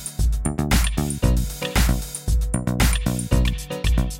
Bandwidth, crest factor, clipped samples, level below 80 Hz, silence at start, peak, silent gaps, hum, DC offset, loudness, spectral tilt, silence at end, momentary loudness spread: 17 kHz; 18 dB; under 0.1%; -22 dBFS; 0 s; -4 dBFS; none; none; under 0.1%; -22 LUFS; -4.5 dB/octave; 0 s; 4 LU